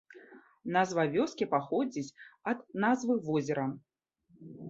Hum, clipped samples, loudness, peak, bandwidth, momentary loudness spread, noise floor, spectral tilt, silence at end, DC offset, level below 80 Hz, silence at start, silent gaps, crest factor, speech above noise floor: none; under 0.1%; -32 LUFS; -14 dBFS; 7.8 kHz; 14 LU; -67 dBFS; -6 dB/octave; 0 s; under 0.1%; -76 dBFS; 0.1 s; none; 20 dB; 36 dB